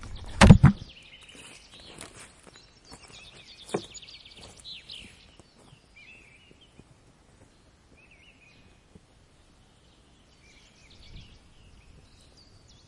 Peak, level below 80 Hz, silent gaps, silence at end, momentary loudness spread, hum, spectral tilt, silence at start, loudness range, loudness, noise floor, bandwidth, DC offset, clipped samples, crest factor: 0 dBFS; -38 dBFS; none; 9.1 s; 33 LU; none; -6 dB/octave; 0.4 s; 31 LU; -20 LUFS; -59 dBFS; 11.5 kHz; under 0.1%; under 0.1%; 30 dB